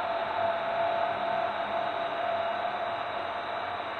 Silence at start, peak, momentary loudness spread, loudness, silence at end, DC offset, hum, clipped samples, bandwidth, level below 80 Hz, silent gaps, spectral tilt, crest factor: 0 s; -16 dBFS; 4 LU; -31 LUFS; 0 s; under 0.1%; none; under 0.1%; 8.6 kHz; -68 dBFS; none; -5 dB/octave; 14 dB